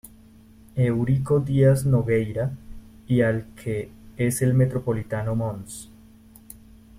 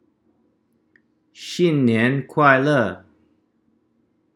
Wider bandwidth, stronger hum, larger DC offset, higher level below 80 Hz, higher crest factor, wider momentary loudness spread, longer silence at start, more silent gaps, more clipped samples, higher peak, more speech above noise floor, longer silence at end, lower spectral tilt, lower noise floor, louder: first, 15.5 kHz vs 12.5 kHz; neither; neither; first, -48 dBFS vs -72 dBFS; about the same, 18 dB vs 22 dB; second, 15 LU vs 18 LU; second, 0.05 s vs 1.4 s; neither; neither; second, -6 dBFS vs 0 dBFS; second, 28 dB vs 48 dB; second, 1.15 s vs 1.4 s; about the same, -7.5 dB/octave vs -6.5 dB/octave; second, -50 dBFS vs -65 dBFS; second, -23 LUFS vs -18 LUFS